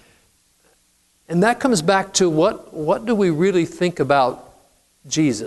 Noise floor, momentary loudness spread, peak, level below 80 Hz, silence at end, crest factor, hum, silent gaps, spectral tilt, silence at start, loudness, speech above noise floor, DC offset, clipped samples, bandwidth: -61 dBFS; 7 LU; -4 dBFS; -54 dBFS; 0 s; 16 dB; none; none; -5 dB/octave; 1.3 s; -19 LUFS; 43 dB; under 0.1%; under 0.1%; 12 kHz